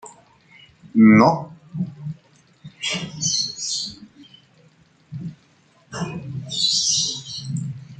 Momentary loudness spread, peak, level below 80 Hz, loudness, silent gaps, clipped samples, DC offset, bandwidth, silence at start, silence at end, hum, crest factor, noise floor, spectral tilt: 21 LU; -2 dBFS; -60 dBFS; -20 LUFS; none; under 0.1%; under 0.1%; 9.4 kHz; 0.05 s; 0.05 s; none; 22 dB; -57 dBFS; -3.5 dB/octave